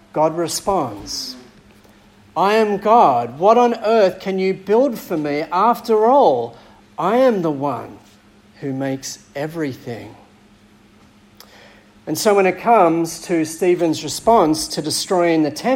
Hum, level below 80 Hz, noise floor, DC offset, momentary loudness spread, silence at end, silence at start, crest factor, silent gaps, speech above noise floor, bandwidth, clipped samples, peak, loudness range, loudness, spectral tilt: none; -54 dBFS; -49 dBFS; under 0.1%; 14 LU; 0 s; 0.15 s; 18 dB; none; 33 dB; 16.5 kHz; under 0.1%; 0 dBFS; 13 LU; -17 LUFS; -4.5 dB/octave